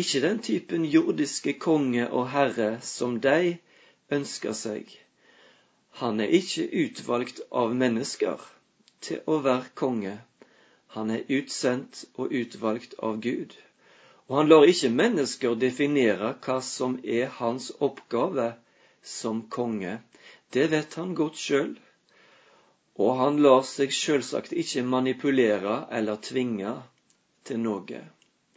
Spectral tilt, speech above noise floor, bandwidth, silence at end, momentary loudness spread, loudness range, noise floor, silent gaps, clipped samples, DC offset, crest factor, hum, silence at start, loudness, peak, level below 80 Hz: -4.5 dB/octave; 42 dB; 8 kHz; 0.5 s; 11 LU; 7 LU; -67 dBFS; none; under 0.1%; under 0.1%; 24 dB; none; 0 s; -26 LUFS; -4 dBFS; -74 dBFS